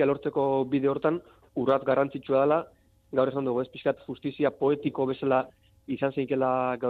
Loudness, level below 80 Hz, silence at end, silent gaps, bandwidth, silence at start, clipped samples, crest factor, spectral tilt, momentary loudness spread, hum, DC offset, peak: -27 LUFS; -66 dBFS; 0 s; none; 4.6 kHz; 0 s; under 0.1%; 16 dB; -9 dB/octave; 9 LU; none; under 0.1%; -12 dBFS